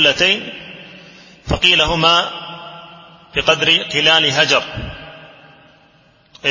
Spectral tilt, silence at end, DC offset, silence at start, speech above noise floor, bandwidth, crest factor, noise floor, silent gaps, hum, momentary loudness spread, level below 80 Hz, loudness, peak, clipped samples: -2.5 dB/octave; 0 s; under 0.1%; 0 s; 37 dB; 8 kHz; 18 dB; -52 dBFS; none; none; 22 LU; -38 dBFS; -13 LUFS; 0 dBFS; under 0.1%